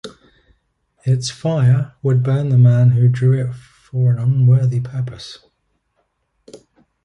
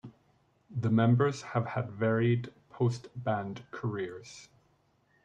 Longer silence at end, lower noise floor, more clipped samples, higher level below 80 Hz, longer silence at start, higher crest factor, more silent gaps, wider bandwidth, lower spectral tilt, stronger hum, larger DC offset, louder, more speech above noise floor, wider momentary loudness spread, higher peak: second, 0.5 s vs 0.8 s; about the same, -68 dBFS vs -70 dBFS; neither; first, -52 dBFS vs -70 dBFS; about the same, 0.05 s vs 0.05 s; about the same, 14 dB vs 18 dB; neither; first, 9.6 kHz vs 8.6 kHz; about the same, -7.5 dB/octave vs -7.5 dB/octave; neither; neither; first, -16 LUFS vs -31 LUFS; first, 53 dB vs 40 dB; about the same, 15 LU vs 16 LU; first, -4 dBFS vs -14 dBFS